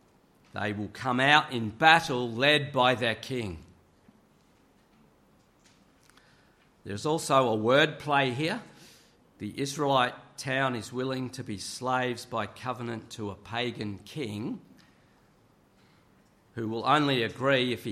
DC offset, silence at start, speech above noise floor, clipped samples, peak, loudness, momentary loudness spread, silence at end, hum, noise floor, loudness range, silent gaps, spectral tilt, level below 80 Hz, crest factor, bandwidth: under 0.1%; 0.55 s; 35 dB; under 0.1%; -4 dBFS; -28 LUFS; 15 LU; 0 s; none; -63 dBFS; 13 LU; none; -4.5 dB/octave; -66 dBFS; 26 dB; 15 kHz